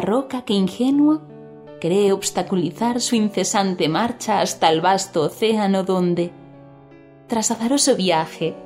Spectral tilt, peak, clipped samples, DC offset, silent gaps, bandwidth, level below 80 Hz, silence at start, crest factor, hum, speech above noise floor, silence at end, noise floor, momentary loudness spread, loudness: -4.5 dB/octave; 0 dBFS; under 0.1%; under 0.1%; none; 16 kHz; -62 dBFS; 0 s; 20 dB; none; 26 dB; 0 s; -45 dBFS; 6 LU; -20 LUFS